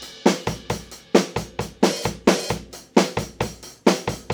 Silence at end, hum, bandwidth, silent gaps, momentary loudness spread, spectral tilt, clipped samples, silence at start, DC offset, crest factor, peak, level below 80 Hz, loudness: 0 s; none; over 20 kHz; none; 9 LU; -4.5 dB/octave; under 0.1%; 0 s; under 0.1%; 22 dB; 0 dBFS; -44 dBFS; -23 LUFS